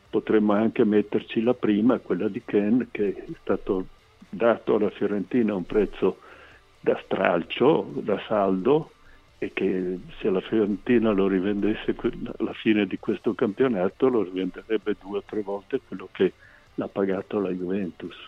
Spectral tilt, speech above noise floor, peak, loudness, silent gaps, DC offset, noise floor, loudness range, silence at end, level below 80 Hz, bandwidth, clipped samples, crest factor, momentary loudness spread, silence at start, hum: -8.5 dB/octave; 27 dB; -4 dBFS; -25 LUFS; none; under 0.1%; -51 dBFS; 3 LU; 0 s; -50 dBFS; 6.4 kHz; under 0.1%; 20 dB; 9 LU; 0.15 s; none